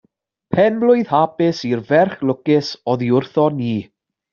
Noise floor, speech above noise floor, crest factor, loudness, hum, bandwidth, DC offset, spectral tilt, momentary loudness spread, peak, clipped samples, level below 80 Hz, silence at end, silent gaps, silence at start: -53 dBFS; 37 dB; 14 dB; -17 LUFS; none; 7.2 kHz; under 0.1%; -5.5 dB/octave; 8 LU; -2 dBFS; under 0.1%; -60 dBFS; 0.5 s; none; 0.5 s